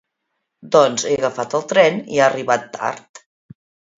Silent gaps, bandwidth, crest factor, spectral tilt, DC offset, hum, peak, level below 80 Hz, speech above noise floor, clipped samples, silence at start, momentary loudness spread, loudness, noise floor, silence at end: none; 7.8 kHz; 18 dB; -3.5 dB/octave; under 0.1%; none; 0 dBFS; -64 dBFS; 58 dB; under 0.1%; 0.65 s; 11 LU; -17 LUFS; -75 dBFS; 1 s